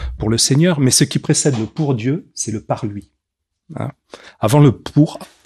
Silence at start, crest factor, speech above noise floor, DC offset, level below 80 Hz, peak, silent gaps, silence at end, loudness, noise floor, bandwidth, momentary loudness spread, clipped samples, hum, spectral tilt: 0 s; 16 dB; 61 dB; under 0.1%; -38 dBFS; 0 dBFS; none; 0.2 s; -16 LUFS; -77 dBFS; 13.5 kHz; 16 LU; under 0.1%; none; -5 dB/octave